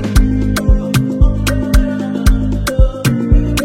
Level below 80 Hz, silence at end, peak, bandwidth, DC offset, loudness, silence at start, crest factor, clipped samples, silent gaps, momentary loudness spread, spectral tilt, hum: -14 dBFS; 0 s; 0 dBFS; 16 kHz; under 0.1%; -15 LUFS; 0 s; 12 dB; under 0.1%; none; 2 LU; -6 dB/octave; none